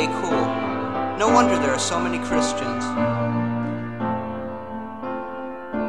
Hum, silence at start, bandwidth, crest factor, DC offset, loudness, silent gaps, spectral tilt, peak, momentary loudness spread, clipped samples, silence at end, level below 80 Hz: none; 0 s; 11.5 kHz; 20 dB; 0.7%; -23 LUFS; none; -5 dB/octave; -4 dBFS; 14 LU; under 0.1%; 0 s; -52 dBFS